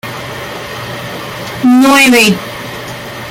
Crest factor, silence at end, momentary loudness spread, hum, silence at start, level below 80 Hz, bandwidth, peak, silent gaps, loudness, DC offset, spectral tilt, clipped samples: 12 dB; 0 s; 18 LU; none; 0.05 s; -44 dBFS; 17 kHz; 0 dBFS; none; -8 LUFS; under 0.1%; -3.5 dB/octave; under 0.1%